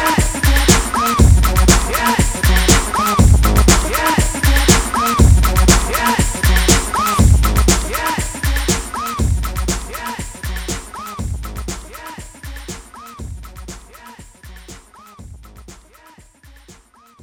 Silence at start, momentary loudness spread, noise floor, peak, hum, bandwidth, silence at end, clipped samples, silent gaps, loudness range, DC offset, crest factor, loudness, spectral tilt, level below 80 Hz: 0 s; 20 LU; -47 dBFS; 0 dBFS; none; over 20 kHz; 0.5 s; under 0.1%; none; 19 LU; under 0.1%; 16 dB; -14 LUFS; -4 dB/octave; -18 dBFS